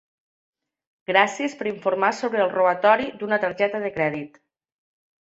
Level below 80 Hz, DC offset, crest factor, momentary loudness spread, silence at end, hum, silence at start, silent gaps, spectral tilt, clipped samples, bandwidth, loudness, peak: -66 dBFS; under 0.1%; 22 dB; 8 LU; 0.95 s; none; 1.1 s; none; -4.5 dB/octave; under 0.1%; 8 kHz; -22 LUFS; -2 dBFS